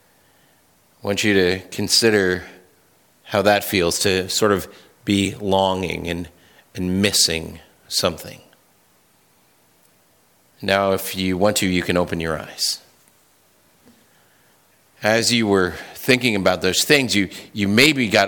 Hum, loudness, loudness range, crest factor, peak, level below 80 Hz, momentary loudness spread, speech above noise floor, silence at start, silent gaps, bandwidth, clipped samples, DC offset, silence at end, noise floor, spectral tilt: none; -19 LUFS; 7 LU; 20 dB; -2 dBFS; -52 dBFS; 13 LU; 39 dB; 1.05 s; none; 19 kHz; under 0.1%; under 0.1%; 0 s; -58 dBFS; -3.5 dB/octave